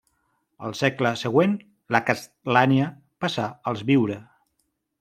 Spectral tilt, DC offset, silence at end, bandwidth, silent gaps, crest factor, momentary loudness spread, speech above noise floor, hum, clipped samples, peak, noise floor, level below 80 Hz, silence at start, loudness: -6 dB/octave; under 0.1%; 0.8 s; 14.5 kHz; none; 22 dB; 10 LU; 52 dB; none; under 0.1%; -2 dBFS; -74 dBFS; -66 dBFS; 0.6 s; -23 LUFS